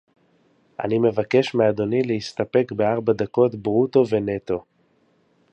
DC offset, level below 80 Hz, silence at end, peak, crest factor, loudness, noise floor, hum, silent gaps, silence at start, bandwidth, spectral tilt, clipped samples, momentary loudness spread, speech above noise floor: under 0.1%; -58 dBFS; 0.9 s; -4 dBFS; 18 dB; -21 LUFS; -62 dBFS; none; none; 0.8 s; 8.4 kHz; -7.5 dB/octave; under 0.1%; 8 LU; 42 dB